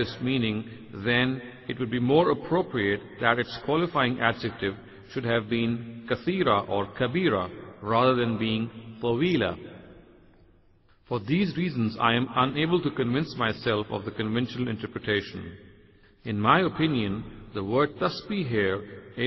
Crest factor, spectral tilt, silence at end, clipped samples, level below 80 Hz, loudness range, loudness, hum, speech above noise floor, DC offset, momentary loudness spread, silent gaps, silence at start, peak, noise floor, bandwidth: 22 dB; -8 dB/octave; 0 s; under 0.1%; -56 dBFS; 4 LU; -27 LUFS; none; 33 dB; under 0.1%; 12 LU; none; 0 s; -6 dBFS; -60 dBFS; 6 kHz